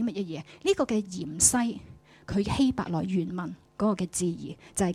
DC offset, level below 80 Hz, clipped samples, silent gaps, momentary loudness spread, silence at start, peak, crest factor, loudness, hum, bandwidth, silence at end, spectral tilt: under 0.1%; -52 dBFS; under 0.1%; none; 14 LU; 0 s; -6 dBFS; 22 dB; -28 LUFS; none; 16 kHz; 0 s; -4.5 dB/octave